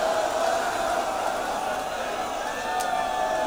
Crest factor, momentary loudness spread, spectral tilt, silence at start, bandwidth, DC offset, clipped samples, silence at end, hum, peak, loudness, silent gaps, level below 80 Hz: 14 dB; 4 LU; -2 dB/octave; 0 s; over 20 kHz; under 0.1%; under 0.1%; 0 s; none; -12 dBFS; -27 LUFS; none; -52 dBFS